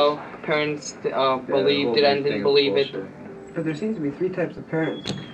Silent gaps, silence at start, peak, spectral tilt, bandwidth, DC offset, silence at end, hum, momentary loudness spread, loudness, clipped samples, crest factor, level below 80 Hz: none; 0 s; -6 dBFS; -5 dB/octave; 8.6 kHz; under 0.1%; 0 s; none; 12 LU; -23 LUFS; under 0.1%; 16 dB; -62 dBFS